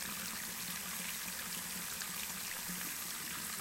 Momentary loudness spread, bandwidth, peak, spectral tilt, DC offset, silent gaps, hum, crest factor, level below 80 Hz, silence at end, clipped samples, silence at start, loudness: 1 LU; 16 kHz; -24 dBFS; -0.5 dB/octave; under 0.1%; none; none; 18 dB; -68 dBFS; 0 s; under 0.1%; 0 s; -39 LUFS